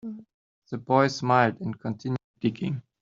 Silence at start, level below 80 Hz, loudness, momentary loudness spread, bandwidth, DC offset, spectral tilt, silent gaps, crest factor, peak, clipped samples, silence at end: 0.05 s; -66 dBFS; -26 LUFS; 16 LU; 7.6 kHz; under 0.1%; -5.5 dB/octave; 0.34-0.62 s, 2.24-2.34 s; 22 dB; -6 dBFS; under 0.1%; 0.2 s